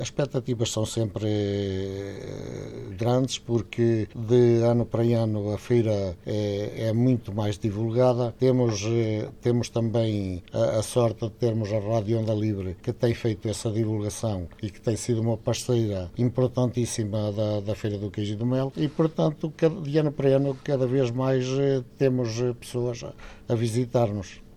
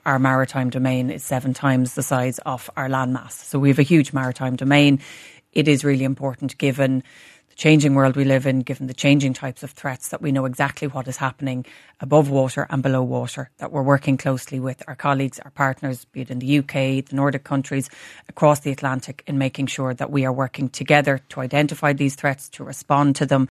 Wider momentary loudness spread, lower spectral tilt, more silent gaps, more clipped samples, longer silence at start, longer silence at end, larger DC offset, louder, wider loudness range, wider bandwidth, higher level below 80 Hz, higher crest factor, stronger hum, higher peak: second, 7 LU vs 12 LU; about the same, -7 dB/octave vs -6 dB/octave; neither; neither; about the same, 0 s vs 0.05 s; about the same, 0 s vs 0.05 s; neither; second, -26 LUFS vs -21 LUFS; about the same, 4 LU vs 4 LU; about the same, 13.5 kHz vs 13.5 kHz; first, -52 dBFS vs -62 dBFS; about the same, 16 dB vs 20 dB; neither; second, -8 dBFS vs 0 dBFS